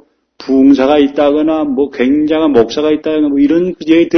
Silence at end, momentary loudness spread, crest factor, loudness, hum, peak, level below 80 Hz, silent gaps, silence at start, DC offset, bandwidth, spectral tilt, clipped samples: 0 s; 5 LU; 10 dB; -11 LUFS; none; 0 dBFS; -44 dBFS; none; 0.4 s; under 0.1%; 6.4 kHz; -6.5 dB/octave; 0.2%